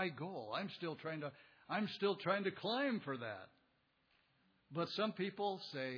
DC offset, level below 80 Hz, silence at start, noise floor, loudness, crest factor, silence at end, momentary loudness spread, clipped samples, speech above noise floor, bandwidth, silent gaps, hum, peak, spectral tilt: under 0.1%; -88 dBFS; 0 s; -78 dBFS; -42 LUFS; 20 dB; 0 s; 9 LU; under 0.1%; 37 dB; 5.4 kHz; none; none; -22 dBFS; -3.5 dB/octave